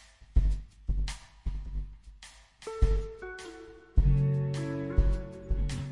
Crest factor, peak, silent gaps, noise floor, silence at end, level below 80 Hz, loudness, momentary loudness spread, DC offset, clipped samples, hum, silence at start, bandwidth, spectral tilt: 20 dB; -10 dBFS; none; -53 dBFS; 0 s; -32 dBFS; -33 LUFS; 19 LU; 0.3%; under 0.1%; none; 0 s; 11 kHz; -7 dB/octave